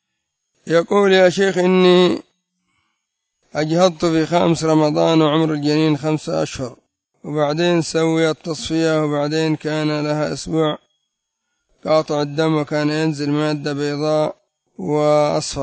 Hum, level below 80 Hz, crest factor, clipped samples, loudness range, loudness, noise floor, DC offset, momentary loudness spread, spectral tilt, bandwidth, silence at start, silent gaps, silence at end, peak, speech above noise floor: none; -52 dBFS; 18 dB; under 0.1%; 4 LU; -17 LUFS; -76 dBFS; under 0.1%; 9 LU; -6 dB/octave; 8 kHz; 0.65 s; none; 0 s; 0 dBFS; 59 dB